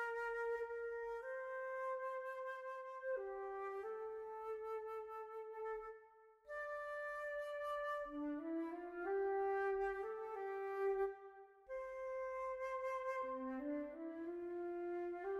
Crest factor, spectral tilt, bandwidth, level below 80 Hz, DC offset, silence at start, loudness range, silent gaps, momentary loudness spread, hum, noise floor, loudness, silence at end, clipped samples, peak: 14 dB; -5 dB/octave; 12.5 kHz; -76 dBFS; under 0.1%; 0 s; 5 LU; none; 9 LU; none; -66 dBFS; -45 LUFS; 0 s; under 0.1%; -30 dBFS